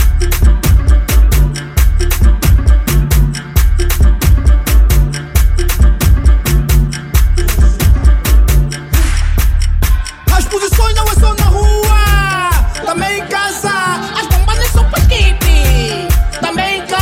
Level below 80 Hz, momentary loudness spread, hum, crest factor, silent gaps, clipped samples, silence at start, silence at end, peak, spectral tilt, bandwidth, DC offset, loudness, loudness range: -10 dBFS; 4 LU; none; 10 dB; none; under 0.1%; 0 s; 0 s; 0 dBFS; -4.5 dB/octave; 16.5 kHz; under 0.1%; -12 LUFS; 1 LU